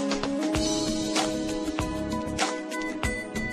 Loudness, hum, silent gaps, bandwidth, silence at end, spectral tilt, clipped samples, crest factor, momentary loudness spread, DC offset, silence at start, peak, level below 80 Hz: -28 LUFS; none; none; 13 kHz; 0 s; -4 dB/octave; under 0.1%; 18 dB; 5 LU; under 0.1%; 0 s; -10 dBFS; -42 dBFS